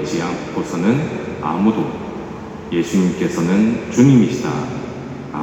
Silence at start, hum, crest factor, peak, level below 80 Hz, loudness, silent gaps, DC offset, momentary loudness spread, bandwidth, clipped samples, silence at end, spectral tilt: 0 s; none; 18 dB; 0 dBFS; -46 dBFS; -18 LUFS; none; under 0.1%; 15 LU; 13.5 kHz; under 0.1%; 0 s; -7 dB/octave